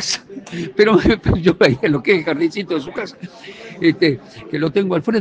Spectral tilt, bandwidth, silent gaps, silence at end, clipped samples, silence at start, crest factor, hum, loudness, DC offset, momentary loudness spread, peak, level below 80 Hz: -5.5 dB/octave; 9.4 kHz; none; 0 s; under 0.1%; 0 s; 18 dB; none; -17 LUFS; under 0.1%; 16 LU; 0 dBFS; -38 dBFS